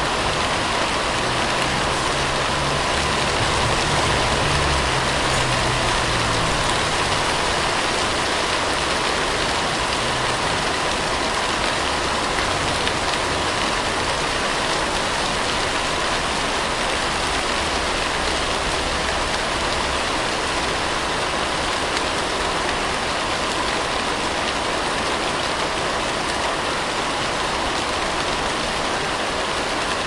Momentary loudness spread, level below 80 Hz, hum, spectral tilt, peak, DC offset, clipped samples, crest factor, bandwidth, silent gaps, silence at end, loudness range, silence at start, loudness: 3 LU; -36 dBFS; none; -2.5 dB/octave; -2 dBFS; under 0.1%; under 0.1%; 18 dB; 11.5 kHz; none; 0 s; 3 LU; 0 s; -20 LUFS